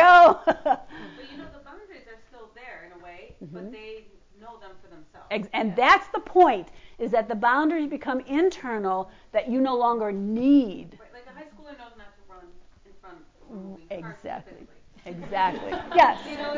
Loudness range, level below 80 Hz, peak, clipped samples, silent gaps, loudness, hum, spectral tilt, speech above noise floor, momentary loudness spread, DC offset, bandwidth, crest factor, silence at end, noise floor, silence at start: 21 LU; -56 dBFS; -6 dBFS; under 0.1%; none; -22 LUFS; none; -5.5 dB/octave; 24 dB; 24 LU; under 0.1%; 7.6 kHz; 18 dB; 0 s; -49 dBFS; 0 s